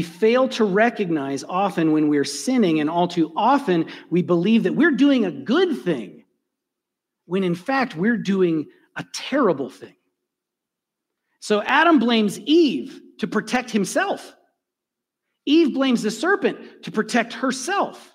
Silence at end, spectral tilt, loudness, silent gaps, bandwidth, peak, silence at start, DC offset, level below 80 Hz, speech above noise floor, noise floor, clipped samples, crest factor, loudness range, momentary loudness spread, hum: 0.15 s; -5 dB/octave; -20 LUFS; none; 15.5 kHz; -4 dBFS; 0 s; under 0.1%; -70 dBFS; 64 dB; -84 dBFS; under 0.1%; 18 dB; 5 LU; 11 LU; none